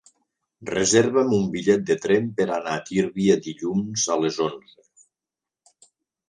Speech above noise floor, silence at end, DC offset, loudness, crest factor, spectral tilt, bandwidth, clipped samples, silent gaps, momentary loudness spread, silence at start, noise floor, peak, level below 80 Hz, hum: 67 dB; 1.7 s; under 0.1%; -22 LUFS; 20 dB; -4.5 dB/octave; 10 kHz; under 0.1%; none; 9 LU; 0.6 s; -89 dBFS; -4 dBFS; -60 dBFS; none